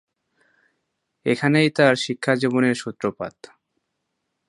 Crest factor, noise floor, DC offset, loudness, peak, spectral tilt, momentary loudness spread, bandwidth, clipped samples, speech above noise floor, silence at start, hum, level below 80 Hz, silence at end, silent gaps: 22 dB; -77 dBFS; under 0.1%; -20 LUFS; -2 dBFS; -5.5 dB/octave; 11 LU; 11.5 kHz; under 0.1%; 57 dB; 1.25 s; none; -66 dBFS; 1.2 s; none